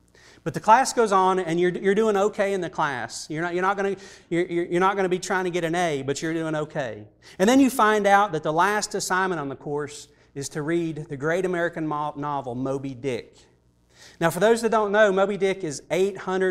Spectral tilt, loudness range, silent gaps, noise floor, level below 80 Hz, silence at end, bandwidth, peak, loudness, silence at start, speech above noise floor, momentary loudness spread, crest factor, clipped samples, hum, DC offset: -5 dB/octave; 6 LU; none; -58 dBFS; -60 dBFS; 0 s; 15.5 kHz; -4 dBFS; -23 LUFS; 0.45 s; 35 dB; 12 LU; 20 dB; under 0.1%; none; under 0.1%